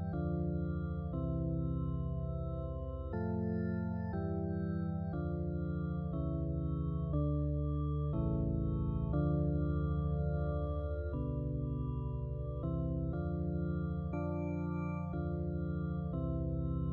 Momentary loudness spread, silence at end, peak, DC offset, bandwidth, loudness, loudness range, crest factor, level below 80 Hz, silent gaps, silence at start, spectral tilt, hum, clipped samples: 4 LU; 0 s; -22 dBFS; under 0.1%; 4.2 kHz; -37 LUFS; 3 LU; 12 dB; -42 dBFS; none; 0 s; -11 dB/octave; none; under 0.1%